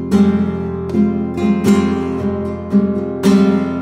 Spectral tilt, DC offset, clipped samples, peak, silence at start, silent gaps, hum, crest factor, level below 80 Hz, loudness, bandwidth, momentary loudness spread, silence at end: -7.5 dB/octave; under 0.1%; under 0.1%; -2 dBFS; 0 s; none; none; 14 dB; -46 dBFS; -16 LUFS; 13.5 kHz; 7 LU; 0 s